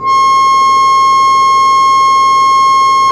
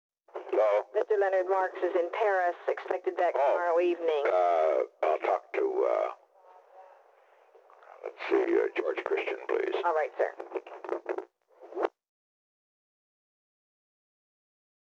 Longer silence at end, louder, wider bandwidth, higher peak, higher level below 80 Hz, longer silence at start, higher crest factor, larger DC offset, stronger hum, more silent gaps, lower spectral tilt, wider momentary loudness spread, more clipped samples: second, 0 s vs 3.1 s; first, -7 LUFS vs -29 LUFS; first, 12.5 kHz vs 7.4 kHz; first, -2 dBFS vs -14 dBFS; first, -46 dBFS vs under -90 dBFS; second, 0 s vs 0.35 s; second, 6 dB vs 16 dB; neither; neither; neither; second, -1 dB/octave vs -3.5 dB/octave; second, 0 LU vs 12 LU; neither